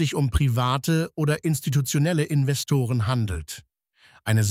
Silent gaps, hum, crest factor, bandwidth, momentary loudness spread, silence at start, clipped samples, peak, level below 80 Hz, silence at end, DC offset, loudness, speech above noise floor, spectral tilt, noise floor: none; none; 16 dB; 16 kHz; 8 LU; 0 s; under 0.1%; -8 dBFS; -38 dBFS; 0 s; under 0.1%; -24 LUFS; 35 dB; -5.5 dB/octave; -57 dBFS